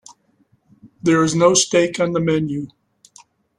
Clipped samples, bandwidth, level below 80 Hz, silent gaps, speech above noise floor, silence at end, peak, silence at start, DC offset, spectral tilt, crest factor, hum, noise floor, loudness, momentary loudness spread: under 0.1%; 12 kHz; -58 dBFS; none; 44 dB; 0.9 s; -2 dBFS; 0.85 s; under 0.1%; -4 dB/octave; 18 dB; none; -61 dBFS; -17 LUFS; 12 LU